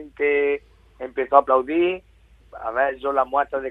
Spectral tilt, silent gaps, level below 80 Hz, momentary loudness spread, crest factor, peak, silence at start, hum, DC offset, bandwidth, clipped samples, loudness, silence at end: -7 dB/octave; none; -54 dBFS; 14 LU; 22 dB; 0 dBFS; 0 s; none; under 0.1%; 4 kHz; under 0.1%; -21 LUFS; 0 s